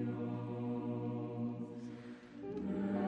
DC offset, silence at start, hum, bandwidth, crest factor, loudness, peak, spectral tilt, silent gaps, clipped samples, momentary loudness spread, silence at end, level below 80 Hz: under 0.1%; 0 s; none; 8 kHz; 14 dB; -42 LUFS; -26 dBFS; -9.5 dB/octave; none; under 0.1%; 10 LU; 0 s; -72 dBFS